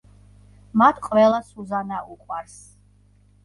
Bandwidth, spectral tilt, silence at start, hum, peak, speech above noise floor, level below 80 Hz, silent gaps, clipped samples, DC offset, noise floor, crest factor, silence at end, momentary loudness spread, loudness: 11.5 kHz; -6 dB/octave; 0.75 s; 50 Hz at -50 dBFS; -2 dBFS; 35 dB; -56 dBFS; none; under 0.1%; under 0.1%; -56 dBFS; 22 dB; 1.05 s; 16 LU; -20 LUFS